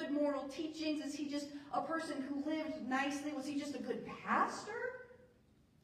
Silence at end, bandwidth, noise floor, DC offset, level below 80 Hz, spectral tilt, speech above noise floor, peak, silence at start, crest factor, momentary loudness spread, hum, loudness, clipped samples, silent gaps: 0.55 s; 14 kHz; -69 dBFS; under 0.1%; -76 dBFS; -4 dB/octave; 29 dB; -20 dBFS; 0 s; 20 dB; 8 LU; none; -40 LUFS; under 0.1%; none